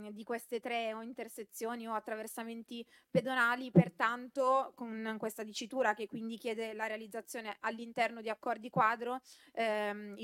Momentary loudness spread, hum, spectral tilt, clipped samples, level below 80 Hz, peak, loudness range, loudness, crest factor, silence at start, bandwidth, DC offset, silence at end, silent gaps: 13 LU; none; -5.5 dB/octave; under 0.1%; -76 dBFS; -14 dBFS; 5 LU; -36 LUFS; 24 dB; 0 s; 16.5 kHz; under 0.1%; 0 s; none